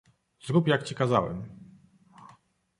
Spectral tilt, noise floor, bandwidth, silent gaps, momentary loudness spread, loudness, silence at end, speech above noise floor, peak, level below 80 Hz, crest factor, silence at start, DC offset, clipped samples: -6.5 dB/octave; -60 dBFS; 11 kHz; none; 19 LU; -27 LUFS; 0.55 s; 34 dB; -8 dBFS; -60 dBFS; 22 dB; 0.45 s; under 0.1%; under 0.1%